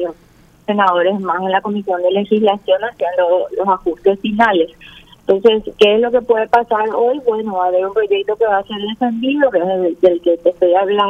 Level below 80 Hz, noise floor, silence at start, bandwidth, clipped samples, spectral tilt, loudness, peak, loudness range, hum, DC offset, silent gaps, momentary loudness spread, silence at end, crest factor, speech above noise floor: -52 dBFS; -48 dBFS; 0 s; 8 kHz; under 0.1%; -6.5 dB/octave; -15 LUFS; 0 dBFS; 2 LU; none; under 0.1%; none; 6 LU; 0 s; 14 dB; 33 dB